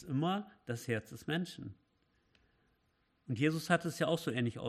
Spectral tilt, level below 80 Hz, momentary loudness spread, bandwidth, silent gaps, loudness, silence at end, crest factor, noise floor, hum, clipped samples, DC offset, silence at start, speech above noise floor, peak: -5.5 dB/octave; -74 dBFS; 11 LU; 14.5 kHz; none; -36 LUFS; 0 s; 22 dB; -77 dBFS; none; under 0.1%; under 0.1%; 0 s; 41 dB; -16 dBFS